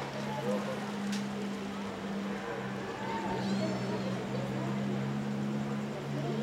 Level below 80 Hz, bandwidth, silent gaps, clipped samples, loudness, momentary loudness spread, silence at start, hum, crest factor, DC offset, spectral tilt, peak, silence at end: -64 dBFS; 15 kHz; none; under 0.1%; -35 LUFS; 4 LU; 0 s; none; 14 dB; under 0.1%; -6 dB/octave; -22 dBFS; 0 s